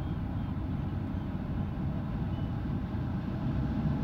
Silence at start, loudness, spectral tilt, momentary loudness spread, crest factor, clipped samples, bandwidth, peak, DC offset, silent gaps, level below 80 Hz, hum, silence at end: 0 s; -34 LUFS; -10 dB/octave; 3 LU; 12 dB; under 0.1%; 6.2 kHz; -20 dBFS; under 0.1%; none; -40 dBFS; none; 0 s